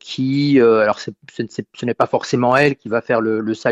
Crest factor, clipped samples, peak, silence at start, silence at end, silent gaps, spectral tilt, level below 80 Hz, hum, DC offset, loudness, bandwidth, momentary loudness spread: 14 dB; under 0.1%; -2 dBFS; 0.05 s; 0 s; none; -6.5 dB/octave; -58 dBFS; none; under 0.1%; -17 LUFS; 8.8 kHz; 14 LU